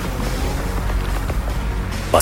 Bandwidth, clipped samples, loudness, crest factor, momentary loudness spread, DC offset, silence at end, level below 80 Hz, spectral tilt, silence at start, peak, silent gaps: 16.5 kHz; under 0.1%; -23 LUFS; 20 dB; 2 LU; under 0.1%; 0 s; -24 dBFS; -5.5 dB/octave; 0 s; 0 dBFS; none